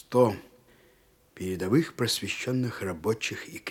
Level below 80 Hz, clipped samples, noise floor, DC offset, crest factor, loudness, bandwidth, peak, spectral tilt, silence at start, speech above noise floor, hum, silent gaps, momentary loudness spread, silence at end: -66 dBFS; under 0.1%; -62 dBFS; under 0.1%; 22 dB; -29 LUFS; 17.5 kHz; -8 dBFS; -5 dB/octave; 0.1 s; 34 dB; none; none; 11 LU; 0 s